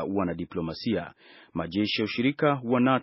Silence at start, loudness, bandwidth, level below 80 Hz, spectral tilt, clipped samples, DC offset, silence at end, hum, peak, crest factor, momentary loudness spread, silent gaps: 0 s; -28 LUFS; 6 kHz; -58 dBFS; -4.5 dB/octave; under 0.1%; under 0.1%; 0 s; none; -8 dBFS; 18 dB; 10 LU; none